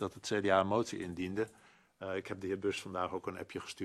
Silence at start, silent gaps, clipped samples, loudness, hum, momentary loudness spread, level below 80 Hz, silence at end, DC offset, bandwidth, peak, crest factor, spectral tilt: 0 s; none; under 0.1%; -36 LUFS; none; 12 LU; -72 dBFS; 0 s; under 0.1%; 13 kHz; -14 dBFS; 22 dB; -5 dB/octave